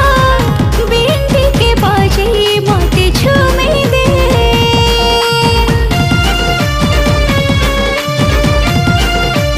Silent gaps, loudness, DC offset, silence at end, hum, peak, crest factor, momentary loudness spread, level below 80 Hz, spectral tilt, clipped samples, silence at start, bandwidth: none; -10 LUFS; under 0.1%; 0 s; none; 0 dBFS; 10 dB; 3 LU; -16 dBFS; -5 dB/octave; under 0.1%; 0 s; 16 kHz